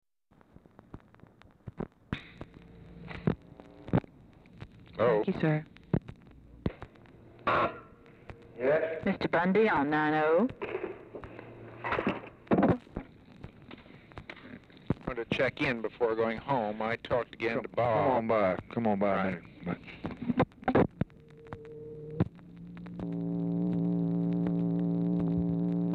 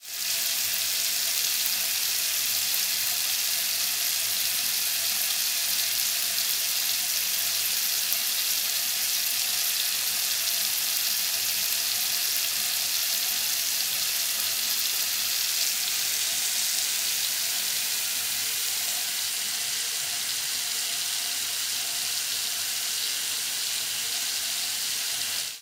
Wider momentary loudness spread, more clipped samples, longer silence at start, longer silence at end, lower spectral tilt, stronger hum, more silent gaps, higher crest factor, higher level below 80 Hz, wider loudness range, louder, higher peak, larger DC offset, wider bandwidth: first, 22 LU vs 3 LU; neither; first, 0.95 s vs 0 s; about the same, 0 s vs 0 s; first, -9 dB/octave vs 3 dB/octave; neither; neither; about the same, 20 dB vs 24 dB; first, -56 dBFS vs -78 dBFS; first, 7 LU vs 3 LU; second, -31 LUFS vs -24 LUFS; second, -12 dBFS vs -2 dBFS; neither; second, 6 kHz vs 16 kHz